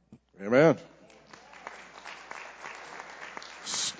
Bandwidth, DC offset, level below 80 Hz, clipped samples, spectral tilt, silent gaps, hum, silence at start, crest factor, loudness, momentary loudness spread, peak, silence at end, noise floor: 8 kHz; under 0.1%; -72 dBFS; under 0.1%; -4 dB/octave; none; none; 0.1 s; 22 dB; -26 LUFS; 23 LU; -8 dBFS; 0.05 s; -54 dBFS